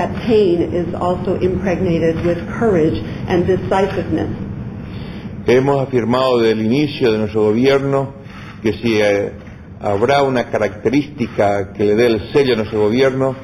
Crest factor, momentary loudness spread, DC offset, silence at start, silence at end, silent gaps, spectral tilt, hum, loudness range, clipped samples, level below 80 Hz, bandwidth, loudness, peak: 14 dB; 12 LU; under 0.1%; 0 s; 0 s; none; -7 dB/octave; none; 2 LU; under 0.1%; -40 dBFS; 12 kHz; -16 LUFS; -2 dBFS